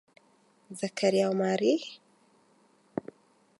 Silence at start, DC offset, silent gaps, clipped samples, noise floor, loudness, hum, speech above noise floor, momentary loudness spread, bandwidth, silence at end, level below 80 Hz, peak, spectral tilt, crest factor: 0.7 s; under 0.1%; none; under 0.1%; -65 dBFS; -29 LUFS; none; 38 dB; 18 LU; 11.5 kHz; 0.6 s; -82 dBFS; -12 dBFS; -5.5 dB/octave; 20 dB